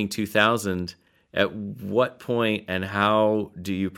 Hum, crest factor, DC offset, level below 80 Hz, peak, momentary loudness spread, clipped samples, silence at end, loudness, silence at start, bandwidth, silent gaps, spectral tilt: none; 22 dB; under 0.1%; -60 dBFS; -4 dBFS; 11 LU; under 0.1%; 0 s; -24 LUFS; 0 s; 17.5 kHz; none; -5 dB/octave